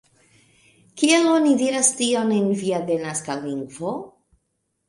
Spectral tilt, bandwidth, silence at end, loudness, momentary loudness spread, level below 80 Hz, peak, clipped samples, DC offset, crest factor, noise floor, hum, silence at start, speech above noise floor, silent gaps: -3.5 dB/octave; 11.5 kHz; 0.8 s; -21 LUFS; 13 LU; -68 dBFS; -4 dBFS; under 0.1%; under 0.1%; 18 dB; -74 dBFS; none; 0.95 s; 53 dB; none